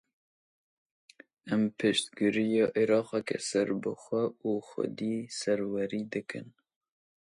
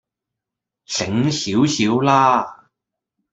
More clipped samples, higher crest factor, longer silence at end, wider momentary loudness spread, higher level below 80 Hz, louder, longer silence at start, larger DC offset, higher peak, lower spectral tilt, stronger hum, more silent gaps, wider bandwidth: neither; about the same, 18 dB vs 18 dB; about the same, 0.75 s vs 0.8 s; about the same, 9 LU vs 10 LU; second, -74 dBFS vs -60 dBFS; second, -31 LUFS vs -17 LUFS; first, 1.45 s vs 0.9 s; neither; second, -14 dBFS vs -2 dBFS; about the same, -5 dB/octave vs -4.5 dB/octave; neither; neither; first, 11.5 kHz vs 8.2 kHz